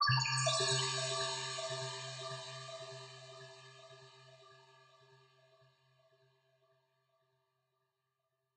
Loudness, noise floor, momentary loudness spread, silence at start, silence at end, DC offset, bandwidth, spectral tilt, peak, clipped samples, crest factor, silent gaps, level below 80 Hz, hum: -36 LUFS; -86 dBFS; 24 LU; 0 s; 3.95 s; under 0.1%; 9.6 kHz; -2.5 dB/octave; -20 dBFS; under 0.1%; 20 dB; none; -76 dBFS; none